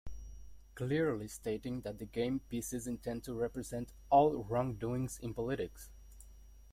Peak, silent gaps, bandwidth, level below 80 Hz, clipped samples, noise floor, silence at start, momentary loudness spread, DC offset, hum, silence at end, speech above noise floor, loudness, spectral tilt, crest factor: -16 dBFS; none; 16.5 kHz; -56 dBFS; under 0.1%; -56 dBFS; 0.05 s; 16 LU; under 0.1%; none; 0.05 s; 20 dB; -37 LUFS; -6 dB/octave; 22 dB